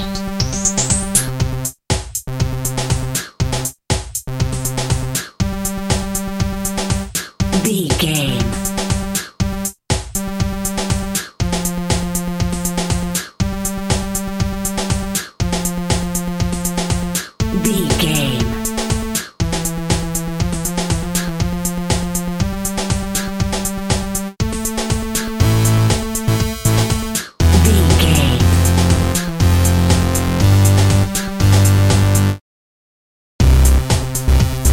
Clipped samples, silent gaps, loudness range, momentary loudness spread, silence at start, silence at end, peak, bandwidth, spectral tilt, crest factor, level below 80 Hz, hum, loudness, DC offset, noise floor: under 0.1%; 32.41-33.39 s; 7 LU; 9 LU; 0 s; 0 s; 0 dBFS; 17 kHz; -4.5 dB/octave; 16 dB; -24 dBFS; none; -17 LUFS; under 0.1%; under -90 dBFS